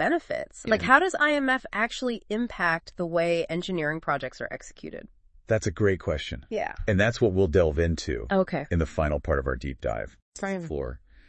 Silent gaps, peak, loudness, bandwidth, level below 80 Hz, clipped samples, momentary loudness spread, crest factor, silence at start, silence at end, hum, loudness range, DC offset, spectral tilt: 10.22-10.32 s; -4 dBFS; -26 LUFS; 8.8 kHz; -42 dBFS; under 0.1%; 13 LU; 22 dB; 0 s; 0.3 s; none; 5 LU; under 0.1%; -6 dB/octave